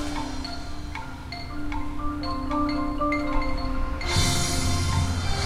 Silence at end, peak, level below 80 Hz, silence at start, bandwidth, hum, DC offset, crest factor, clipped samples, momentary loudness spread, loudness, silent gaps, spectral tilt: 0 s; -10 dBFS; -32 dBFS; 0 s; 15.5 kHz; none; under 0.1%; 16 dB; under 0.1%; 12 LU; -28 LUFS; none; -4.5 dB/octave